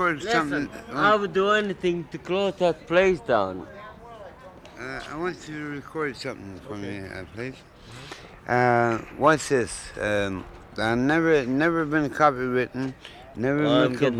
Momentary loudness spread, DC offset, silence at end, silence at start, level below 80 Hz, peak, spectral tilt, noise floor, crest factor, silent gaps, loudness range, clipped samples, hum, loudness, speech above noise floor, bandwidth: 20 LU; under 0.1%; 0 s; 0 s; -52 dBFS; -6 dBFS; -5.5 dB/octave; -45 dBFS; 20 dB; none; 11 LU; under 0.1%; none; -24 LUFS; 21 dB; 13.5 kHz